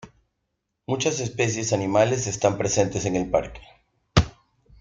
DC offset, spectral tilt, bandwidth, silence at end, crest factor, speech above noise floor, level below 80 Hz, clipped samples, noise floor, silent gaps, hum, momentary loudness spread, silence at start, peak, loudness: under 0.1%; -4.5 dB/octave; 9.6 kHz; 0.5 s; 22 dB; 55 dB; -42 dBFS; under 0.1%; -78 dBFS; none; none; 8 LU; 0.05 s; -2 dBFS; -24 LUFS